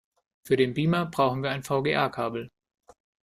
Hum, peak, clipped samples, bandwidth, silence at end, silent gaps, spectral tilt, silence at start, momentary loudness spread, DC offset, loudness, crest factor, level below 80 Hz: none; -8 dBFS; under 0.1%; 15 kHz; 0.8 s; none; -6.5 dB/octave; 0.45 s; 8 LU; under 0.1%; -26 LUFS; 18 dB; -62 dBFS